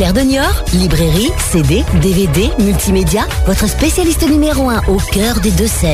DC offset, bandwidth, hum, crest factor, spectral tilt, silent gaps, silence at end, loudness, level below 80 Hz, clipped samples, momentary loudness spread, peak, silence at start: under 0.1%; 16 kHz; none; 8 dB; -5 dB/octave; none; 0 s; -12 LUFS; -18 dBFS; under 0.1%; 2 LU; -2 dBFS; 0 s